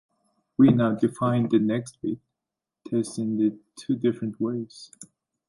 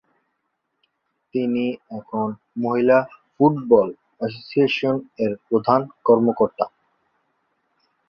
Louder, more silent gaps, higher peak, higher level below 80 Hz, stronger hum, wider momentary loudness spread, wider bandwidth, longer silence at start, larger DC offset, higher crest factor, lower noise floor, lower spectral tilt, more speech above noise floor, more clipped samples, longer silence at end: second, -25 LUFS vs -21 LUFS; neither; second, -6 dBFS vs -2 dBFS; about the same, -64 dBFS vs -64 dBFS; neither; first, 18 LU vs 12 LU; first, 11.5 kHz vs 6.4 kHz; second, 0.6 s vs 1.35 s; neither; about the same, 20 dB vs 20 dB; first, -87 dBFS vs -75 dBFS; about the same, -7.5 dB/octave vs -8.5 dB/octave; first, 63 dB vs 55 dB; neither; second, 0.45 s vs 1.4 s